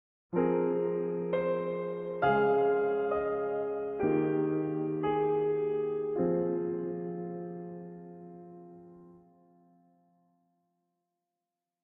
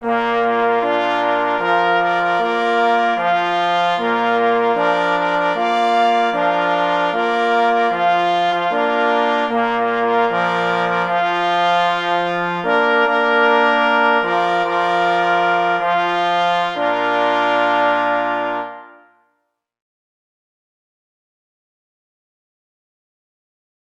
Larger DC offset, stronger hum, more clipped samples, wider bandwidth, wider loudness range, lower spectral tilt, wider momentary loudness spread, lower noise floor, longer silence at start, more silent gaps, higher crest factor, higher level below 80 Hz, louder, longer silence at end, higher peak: neither; neither; neither; second, 4 kHz vs 9 kHz; first, 15 LU vs 3 LU; first, -10.5 dB/octave vs -5 dB/octave; first, 18 LU vs 3 LU; first, -89 dBFS vs -71 dBFS; first, 0.3 s vs 0 s; neither; about the same, 18 dB vs 16 dB; second, -68 dBFS vs -62 dBFS; second, -31 LUFS vs -16 LUFS; second, 2.65 s vs 5.1 s; second, -14 dBFS vs -2 dBFS